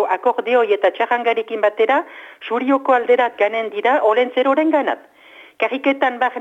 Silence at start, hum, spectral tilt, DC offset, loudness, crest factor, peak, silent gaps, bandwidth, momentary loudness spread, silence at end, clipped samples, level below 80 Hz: 0 s; none; -4.5 dB/octave; under 0.1%; -17 LUFS; 14 dB; -4 dBFS; none; 7.6 kHz; 7 LU; 0 s; under 0.1%; -74 dBFS